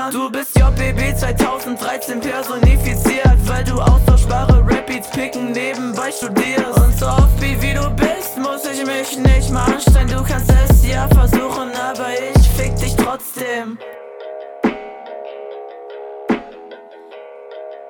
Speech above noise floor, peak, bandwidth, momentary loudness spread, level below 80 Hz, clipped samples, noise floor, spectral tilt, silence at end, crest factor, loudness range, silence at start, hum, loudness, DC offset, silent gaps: 23 dB; -2 dBFS; 19 kHz; 18 LU; -18 dBFS; under 0.1%; -37 dBFS; -6 dB/octave; 0 s; 12 dB; 11 LU; 0 s; none; -16 LUFS; under 0.1%; none